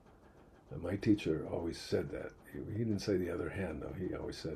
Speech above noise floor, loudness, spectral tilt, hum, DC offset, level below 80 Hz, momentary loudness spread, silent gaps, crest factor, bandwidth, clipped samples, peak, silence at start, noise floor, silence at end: 24 dB; -38 LUFS; -6.5 dB/octave; none; under 0.1%; -58 dBFS; 12 LU; none; 20 dB; 13.5 kHz; under 0.1%; -18 dBFS; 0.1 s; -61 dBFS; 0 s